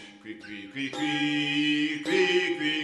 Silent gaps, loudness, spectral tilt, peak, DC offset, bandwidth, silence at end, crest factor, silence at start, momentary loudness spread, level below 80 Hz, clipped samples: none; -26 LUFS; -4 dB/octave; -12 dBFS; under 0.1%; 11.5 kHz; 0 s; 16 dB; 0 s; 17 LU; -72 dBFS; under 0.1%